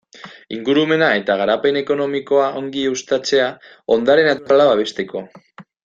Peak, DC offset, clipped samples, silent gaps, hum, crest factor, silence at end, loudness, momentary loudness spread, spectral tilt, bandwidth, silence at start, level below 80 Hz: -2 dBFS; under 0.1%; under 0.1%; none; none; 16 dB; 0.2 s; -17 LUFS; 12 LU; -4.5 dB/octave; 7.6 kHz; 0.25 s; -62 dBFS